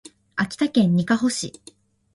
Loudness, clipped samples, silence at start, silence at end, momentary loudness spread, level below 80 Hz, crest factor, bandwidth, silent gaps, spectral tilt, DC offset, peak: -22 LUFS; under 0.1%; 0.35 s; 0.65 s; 11 LU; -60 dBFS; 18 dB; 11.5 kHz; none; -5 dB/octave; under 0.1%; -6 dBFS